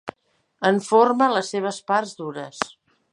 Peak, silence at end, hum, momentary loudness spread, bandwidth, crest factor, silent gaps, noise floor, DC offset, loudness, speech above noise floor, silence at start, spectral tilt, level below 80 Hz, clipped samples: -2 dBFS; 0.45 s; none; 15 LU; 11.5 kHz; 20 dB; none; -64 dBFS; under 0.1%; -22 LUFS; 43 dB; 0.05 s; -4.5 dB/octave; -70 dBFS; under 0.1%